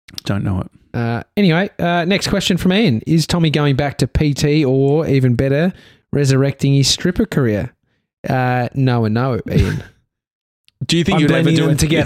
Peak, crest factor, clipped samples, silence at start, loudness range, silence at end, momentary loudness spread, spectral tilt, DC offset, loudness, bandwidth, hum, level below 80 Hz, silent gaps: -2 dBFS; 14 dB; under 0.1%; 0.25 s; 3 LU; 0 s; 8 LU; -6 dB/octave; under 0.1%; -16 LUFS; 15.5 kHz; none; -36 dBFS; 8.13-8.24 s, 10.32-10.64 s